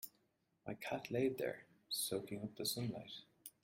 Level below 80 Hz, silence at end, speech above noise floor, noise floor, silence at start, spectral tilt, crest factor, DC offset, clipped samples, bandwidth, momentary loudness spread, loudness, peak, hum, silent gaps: -78 dBFS; 0.15 s; 38 dB; -81 dBFS; 0 s; -4 dB/octave; 20 dB; under 0.1%; under 0.1%; 16.5 kHz; 15 LU; -42 LUFS; -24 dBFS; none; none